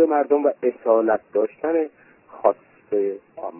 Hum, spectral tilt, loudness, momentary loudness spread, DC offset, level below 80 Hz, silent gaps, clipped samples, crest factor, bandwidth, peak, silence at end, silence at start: none; -10.5 dB/octave; -22 LUFS; 9 LU; under 0.1%; -68 dBFS; none; under 0.1%; 18 dB; 3 kHz; -2 dBFS; 0 s; 0 s